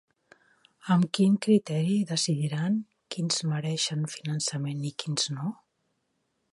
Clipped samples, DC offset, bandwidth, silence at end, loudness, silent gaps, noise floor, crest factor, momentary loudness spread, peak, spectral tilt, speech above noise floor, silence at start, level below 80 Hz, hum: under 0.1%; under 0.1%; 11.5 kHz; 1 s; -28 LUFS; none; -76 dBFS; 16 dB; 10 LU; -12 dBFS; -5 dB/octave; 49 dB; 0.85 s; -74 dBFS; none